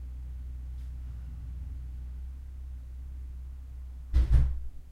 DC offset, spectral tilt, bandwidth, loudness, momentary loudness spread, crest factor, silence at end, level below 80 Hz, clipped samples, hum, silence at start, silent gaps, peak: under 0.1%; -8 dB/octave; 4.7 kHz; -36 LUFS; 17 LU; 20 dB; 0 s; -32 dBFS; under 0.1%; none; 0 s; none; -12 dBFS